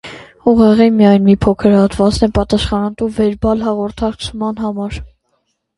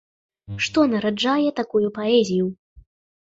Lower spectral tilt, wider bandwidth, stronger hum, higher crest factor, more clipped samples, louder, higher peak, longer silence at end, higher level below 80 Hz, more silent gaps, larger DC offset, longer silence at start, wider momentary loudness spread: first, -7 dB/octave vs -5 dB/octave; first, 11.5 kHz vs 8 kHz; neither; about the same, 14 dB vs 16 dB; neither; first, -13 LUFS vs -21 LUFS; first, 0 dBFS vs -6 dBFS; first, 0.7 s vs 0.45 s; first, -30 dBFS vs -56 dBFS; second, none vs 2.59-2.76 s; neither; second, 0.05 s vs 0.5 s; first, 11 LU vs 7 LU